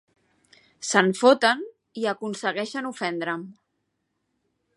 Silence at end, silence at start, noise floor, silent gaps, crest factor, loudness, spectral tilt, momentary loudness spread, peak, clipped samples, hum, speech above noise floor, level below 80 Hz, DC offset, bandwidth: 1.25 s; 0.8 s; -77 dBFS; none; 24 dB; -24 LUFS; -3.5 dB/octave; 16 LU; -2 dBFS; under 0.1%; none; 53 dB; -80 dBFS; under 0.1%; 11.5 kHz